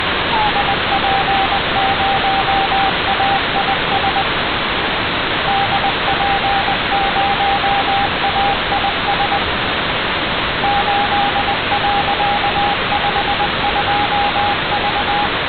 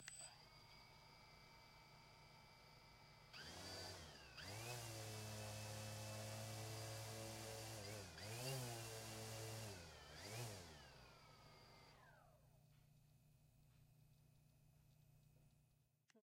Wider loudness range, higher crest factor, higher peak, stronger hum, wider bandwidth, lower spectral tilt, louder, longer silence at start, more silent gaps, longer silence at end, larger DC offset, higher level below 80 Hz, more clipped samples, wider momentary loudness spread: second, 1 LU vs 12 LU; second, 14 dB vs 20 dB; first, -2 dBFS vs -36 dBFS; second, none vs 60 Hz at -80 dBFS; second, 4.8 kHz vs 16 kHz; first, -7.5 dB/octave vs -3.5 dB/octave; first, -15 LUFS vs -53 LUFS; about the same, 0 s vs 0 s; neither; about the same, 0 s vs 0 s; neither; first, -34 dBFS vs -74 dBFS; neither; second, 2 LU vs 14 LU